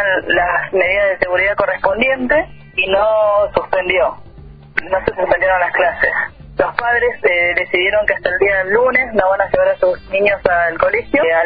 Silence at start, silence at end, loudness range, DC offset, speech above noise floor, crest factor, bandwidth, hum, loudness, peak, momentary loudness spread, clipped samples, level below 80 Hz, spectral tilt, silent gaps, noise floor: 0 s; 0 s; 2 LU; under 0.1%; 23 dB; 16 dB; 5 kHz; none; -15 LUFS; 0 dBFS; 5 LU; under 0.1%; -40 dBFS; -7 dB/octave; none; -37 dBFS